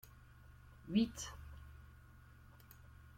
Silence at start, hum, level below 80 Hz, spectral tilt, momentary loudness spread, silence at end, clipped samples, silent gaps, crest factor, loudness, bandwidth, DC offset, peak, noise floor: 0.05 s; none; -60 dBFS; -5 dB/octave; 25 LU; 0 s; under 0.1%; none; 24 dB; -39 LUFS; 16.5 kHz; under 0.1%; -22 dBFS; -61 dBFS